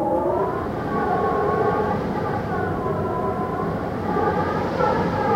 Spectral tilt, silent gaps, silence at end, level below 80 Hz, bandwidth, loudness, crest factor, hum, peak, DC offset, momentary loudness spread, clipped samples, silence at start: -8 dB/octave; none; 0 s; -44 dBFS; 16.5 kHz; -23 LUFS; 14 dB; none; -8 dBFS; under 0.1%; 4 LU; under 0.1%; 0 s